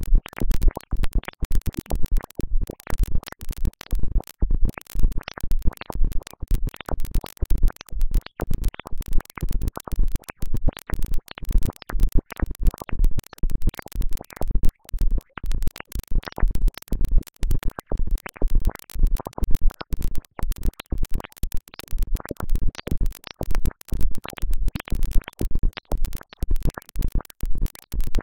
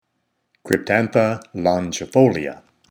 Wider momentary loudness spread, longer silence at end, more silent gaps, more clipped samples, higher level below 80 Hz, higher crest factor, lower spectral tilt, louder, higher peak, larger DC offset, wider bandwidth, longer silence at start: about the same, 6 LU vs 7 LU; second, 0 s vs 0.35 s; first, 1.45-1.50 s vs none; neither; first, -22 dBFS vs -56 dBFS; about the same, 16 dB vs 20 dB; about the same, -6 dB/octave vs -6 dB/octave; second, -30 LUFS vs -19 LUFS; second, -4 dBFS vs 0 dBFS; neither; second, 17 kHz vs over 20 kHz; second, 0 s vs 0.65 s